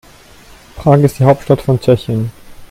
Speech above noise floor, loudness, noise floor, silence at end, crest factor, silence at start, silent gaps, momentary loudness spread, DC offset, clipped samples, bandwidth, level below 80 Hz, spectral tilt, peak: 29 dB; -13 LUFS; -40 dBFS; 0.05 s; 14 dB; 0.75 s; none; 9 LU; under 0.1%; under 0.1%; 15.5 kHz; -40 dBFS; -8 dB/octave; 0 dBFS